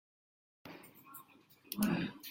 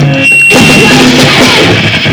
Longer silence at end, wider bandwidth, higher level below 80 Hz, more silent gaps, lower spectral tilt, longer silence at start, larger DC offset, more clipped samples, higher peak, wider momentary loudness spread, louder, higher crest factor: about the same, 0 s vs 0 s; second, 16.5 kHz vs over 20 kHz; second, -72 dBFS vs -30 dBFS; neither; about the same, -5 dB/octave vs -4 dB/octave; first, 0.65 s vs 0 s; neither; second, under 0.1% vs 2%; second, -20 dBFS vs 0 dBFS; first, 20 LU vs 3 LU; second, -37 LUFS vs -2 LUFS; first, 22 dB vs 4 dB